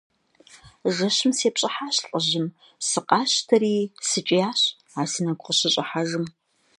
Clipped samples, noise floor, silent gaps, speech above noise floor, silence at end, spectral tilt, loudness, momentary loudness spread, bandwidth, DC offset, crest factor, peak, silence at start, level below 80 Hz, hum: under 0.1%; -53 dBFS; none; 30 dB; 0.5 s; -3 dB/octave; -23 LUFS; 8 LU; 11.5 kHz; under 0.1%; 22 dB; -2 dBFS; 0.55 s; -70 dBFS; none